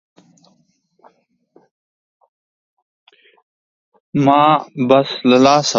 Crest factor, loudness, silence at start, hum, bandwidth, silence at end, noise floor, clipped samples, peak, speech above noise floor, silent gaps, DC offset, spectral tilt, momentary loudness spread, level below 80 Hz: 18 dB; -14 LUFS; 4.15 s; none; 7.6 kHz; 0 s; -61 dBFS; under 0.1%; 0 dBFS; 48 dB; none; under 0.1%; -5 dB/octave; 6 LU; -62 dBFS